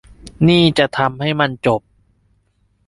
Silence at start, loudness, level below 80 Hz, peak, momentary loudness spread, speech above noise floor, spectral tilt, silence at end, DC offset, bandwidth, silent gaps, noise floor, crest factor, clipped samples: 0.25 s; -16 LUFS; -46 dBFS; -2 dBFS; 7 LU; 46 dB; -6.5 dB/octave; 1.1 s; under 0.1%; 11.5 kHz; none; -61 dBFS; 16 dB; under 0.1%